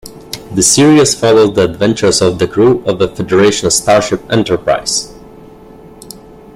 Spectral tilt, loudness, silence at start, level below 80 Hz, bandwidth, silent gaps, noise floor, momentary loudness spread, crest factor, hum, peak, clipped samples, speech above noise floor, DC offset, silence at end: -4 dB/octave; -10 LUFS; 0.05 s; -42 dBFS; 16 kHz; none; -36 dBFS; 8 LU; 12 dB; none; 0 dBFS; under 0.1%; 25 dB; under 0.1%; 0.4 s